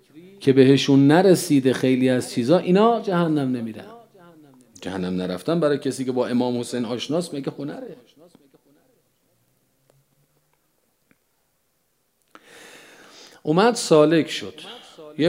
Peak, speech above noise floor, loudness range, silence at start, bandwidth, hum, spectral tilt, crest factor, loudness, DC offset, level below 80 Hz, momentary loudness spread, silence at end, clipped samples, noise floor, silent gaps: -2 dBFS; 50 dB; 14 LU; 0.15 s; 16 kHz; none; -6 dB/octave; 20 dB; -20 LUFS; under 0.1%; -72 dBFS; 19 LU; 0 s; under 0.1%; -69 dBFS; none